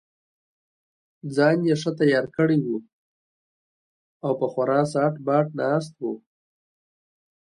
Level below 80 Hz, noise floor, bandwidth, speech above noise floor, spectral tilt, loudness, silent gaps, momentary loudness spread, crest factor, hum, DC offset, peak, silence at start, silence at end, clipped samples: -70 dBFS; under -90 dBFS; 11.5 kHz; over 68 dB; -7 dB/octave; -23 LUFS; 2.93-4.20 s; 12 LU; 18 dB; none; under 0.1%; -6 dBFS; 1.25 s; 1.3 s; under 0.1%